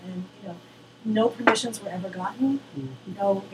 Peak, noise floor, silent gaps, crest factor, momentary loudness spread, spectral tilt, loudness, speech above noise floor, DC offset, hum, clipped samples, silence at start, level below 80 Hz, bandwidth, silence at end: -2 dBFS; -48 dBFS; none; 24 dB; 18 LU; -4.5 dB/octave; -26 LUFS; 23 dB; under 0.1%; none; under 0.1%; 0 s; -72 dBFS; 14.5 kHz; 0 s